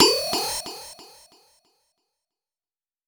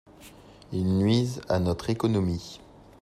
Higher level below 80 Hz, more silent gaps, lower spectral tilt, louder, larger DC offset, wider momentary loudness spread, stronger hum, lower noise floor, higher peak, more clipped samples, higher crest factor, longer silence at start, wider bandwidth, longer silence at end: second, -62 dBFS vs -52 dBFS; neither; second, -1 dB/octave vs -7 dB/octave; first, -23 LUFS vs -27 LUFS; neither; first, 24 LU vs 12 LU; neither; first, under -90 dBFS vs -50 dBFS; first, 0 dBFS vs -12 dBFS; neither; first, 28 dB vs 16 dB; second, 0 s vs 0.2 s; first, over 20 kHz vs 13.5 kHz; first, 2.05 s vs 0.45 s